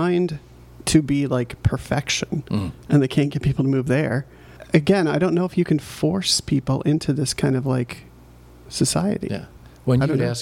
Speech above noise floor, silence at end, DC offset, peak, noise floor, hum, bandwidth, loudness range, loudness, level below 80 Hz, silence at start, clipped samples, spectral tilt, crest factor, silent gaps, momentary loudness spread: 25 dB; 0 s; under 0.1%; -2 dBFS; -46 dBFS; none; 16 kHz; 3 LU; -21 LUFS; -42 dBFS; 0 s; under 0.1%; -5.5 dB/octave; 18 dB; none; 9 LU